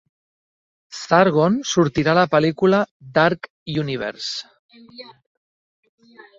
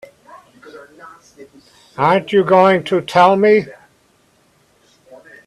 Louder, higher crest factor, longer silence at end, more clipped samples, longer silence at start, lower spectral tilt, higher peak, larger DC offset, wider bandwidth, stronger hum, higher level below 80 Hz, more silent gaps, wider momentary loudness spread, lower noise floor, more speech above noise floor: second, -19 LUFS vs -13 LUFS; about the same, 18 dB vs 18 dB; second, 1.35 s vs 1.75 s; neither; first, 0.9 s vs 0.35 s; about the same, -5.5 dB/octave vs -6.5 dB/octave; about the same, -2 dBFS vs 0 dBFS; neither; second, 7.8 kHz vs 12 kHz; neither; first, -56 dBFS vs -62 dBFS; first, 2.91-3.00 s, 3.50-3.66 s, 4.59-4.69 s vs none; first, 15 LU vs 7 LU; first, under -90 dBFS vs -56 dBFS; first, over 71 dB vs 42 dB